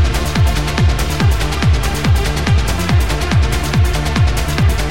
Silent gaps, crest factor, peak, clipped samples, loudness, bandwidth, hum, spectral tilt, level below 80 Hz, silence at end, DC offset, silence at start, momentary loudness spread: none; 12 dB; 0 dBFS; under 0.1%; -15 LUFS; 17 kHz; none; -5 dB/octave; -18 dBFS; 0 s; 4%; 0 s; 1 LU